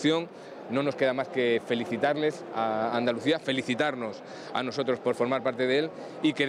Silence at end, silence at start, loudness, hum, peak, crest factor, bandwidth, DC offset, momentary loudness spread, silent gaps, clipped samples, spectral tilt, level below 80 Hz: 0 s; 0 s; -28 LUFS; none; -12 dBFS; 16 dB; 11.5 kHz; under 0.1%; 8 LU; none; under 0.1%; -5.5 dB/octave; -78 dBFS